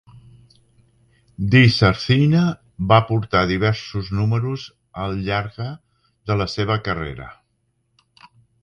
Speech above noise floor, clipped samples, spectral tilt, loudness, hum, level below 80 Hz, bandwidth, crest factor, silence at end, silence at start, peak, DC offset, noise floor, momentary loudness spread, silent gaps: 50 dB; under 0.1%; -7 dB/octave; -19 LUFS; none; -42 dBFS; 7.2 kHz; 20 dB; 1.3 s; 0.15 s; 0 dBFS; under 0.1%; -68 dBFS; 17 LU; none